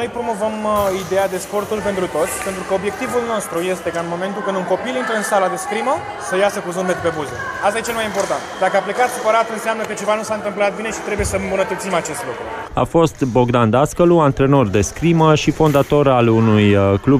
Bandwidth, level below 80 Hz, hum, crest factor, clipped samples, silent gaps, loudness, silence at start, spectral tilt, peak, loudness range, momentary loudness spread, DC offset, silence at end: 15.5 kHz; -40 dBFS; none; 14 dB; under 0.1%; none; -17 LUFS; 0 s; -5.5 dB/octave; -2 dBFS; 6 LU; 9 LU; under 0.1%; 0 s